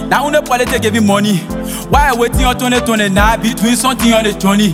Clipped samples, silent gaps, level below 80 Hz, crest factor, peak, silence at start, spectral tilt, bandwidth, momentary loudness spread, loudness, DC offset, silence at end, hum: under 0.1%; none; -24 dBFS; 12 dB; 0 dBFS; 0 s; -4.5 dB/octave; 16.5 kHz; 3 LU; -12 LUFS; under 0.1%; 0 s; none